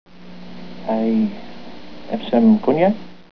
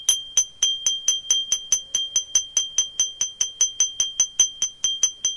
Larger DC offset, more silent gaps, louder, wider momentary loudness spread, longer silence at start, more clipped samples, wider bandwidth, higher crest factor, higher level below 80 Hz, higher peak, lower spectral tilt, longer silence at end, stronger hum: first, 2% vs under 0.1%; neither; about the same, -18 LUFS vs -20 LUFS; first, 24 LU vs 3 LU; about the same, 0.05 s vs 0 s; neither; second, 5.4 kHz vs 11.5 kHz; about the same, 16 dB vs 20 dB; about the same, -56 dBFS vs -60 dBFS; about the same, -2 dBFS vs -4 dBFS; first, -9 dB/octave vs 4 dB/octave; about the same, 0.1 s vs 0 s; first, 60 Hz at -40 dBFS vs none